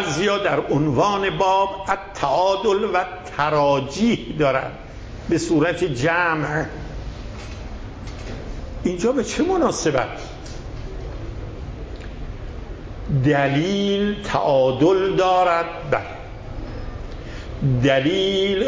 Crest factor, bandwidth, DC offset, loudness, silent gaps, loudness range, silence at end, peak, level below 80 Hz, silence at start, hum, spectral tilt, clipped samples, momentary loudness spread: 16 dB; 8 kHz; under 0.1%; -20 LUFS; none; 6 LU; 0 s; -4 dBFS; -36 dBFS; 0 s; none; -5.5 dB/octave; under 0.1%; 17 LU